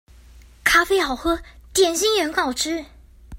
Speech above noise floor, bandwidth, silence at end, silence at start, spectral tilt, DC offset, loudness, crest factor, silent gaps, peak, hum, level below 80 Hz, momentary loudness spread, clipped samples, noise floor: 26 dB; 16.5 kHz; 0 s; 0.35 s; -1.5 dB/octave; under 0.1%; -20 LUFS; 20 dB; none; -2 dBFS; none; -42 dBFS; 9 LU; under 0.1%; -47 dBFS